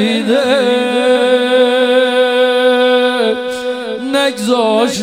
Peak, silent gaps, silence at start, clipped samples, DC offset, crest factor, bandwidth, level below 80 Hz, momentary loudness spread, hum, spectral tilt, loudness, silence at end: 0 dBFS; none; 0 s; under 0.1%; 0.2%; 12 dB; 15 kHz; -60 dBFS; 7 LU; none; -3.5 dB/octave; -12 LUFS; 0 s